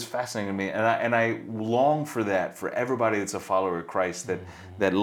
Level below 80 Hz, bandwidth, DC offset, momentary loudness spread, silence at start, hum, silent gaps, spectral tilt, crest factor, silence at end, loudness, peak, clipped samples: -66 dBFS; 18.5 kHz; under 0.1%; 8 LU; 0 s; none; none; -5 dB/octave; 18 dB; 0 s; -27 LUFS; -8 dBFS; under 0.1%